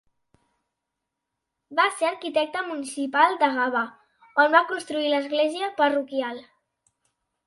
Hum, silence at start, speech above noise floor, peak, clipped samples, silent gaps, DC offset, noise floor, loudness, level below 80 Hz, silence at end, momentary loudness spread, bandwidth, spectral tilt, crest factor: none; 1.7 s; 60 dB; -4 dBFS; under 0.1%; none; under 0.1%; -83 dBFS; -24 LUFS; -78 dBFS; 1.05 s; 11 LU; 11.5 kHz; -2 dB/octave; 22 dB